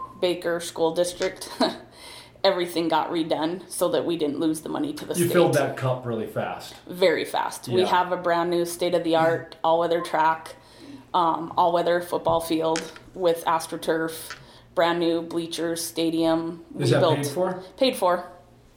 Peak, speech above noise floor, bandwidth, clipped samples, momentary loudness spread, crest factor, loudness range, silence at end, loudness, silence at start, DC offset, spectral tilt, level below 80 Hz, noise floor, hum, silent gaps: -6 dBFS; 21 dB; over 20 kHz; under 0.1%; 9 LU; 18 dB; 2 LU; 0.4 s; -24 LUFS; 0 s; under 0.1%; -5 dB/octave; -60 dBFS; -45 dBFS; none; none